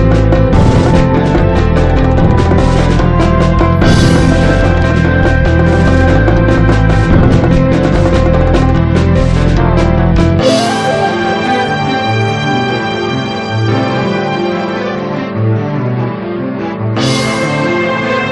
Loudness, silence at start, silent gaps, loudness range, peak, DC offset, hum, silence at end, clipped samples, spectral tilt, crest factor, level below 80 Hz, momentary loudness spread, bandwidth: -11 LUFS; 0 s; none; 5 LU; 0 dBFS; under 0.1%; none; 0 s; 0.3%; -7 dB/octave; 10 dB; -16 dBFS; 7 LU; 11.5 kHz